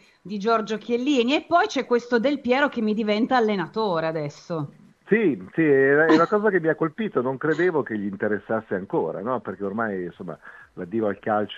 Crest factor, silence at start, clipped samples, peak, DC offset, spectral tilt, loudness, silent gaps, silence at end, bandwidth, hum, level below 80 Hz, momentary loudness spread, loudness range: 18 dB; 0.25 s; under 0.1%; -6 dBFS; under 0.1%; -6 dB/octave; -23 LUFS; none; 0 s; 7.6 kHz; none; -66 dBFS; 13 LU; 6 LU